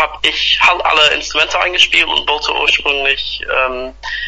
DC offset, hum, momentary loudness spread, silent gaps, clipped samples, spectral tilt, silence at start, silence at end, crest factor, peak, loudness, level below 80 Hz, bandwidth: under 0.1%; none; 7 LU; none; under 0.1%; -0.5 dB/octave; 0 s; 0 s; 14 dB; 0 dBFS; -12 LUFS; -38 dBFS; 11 kHz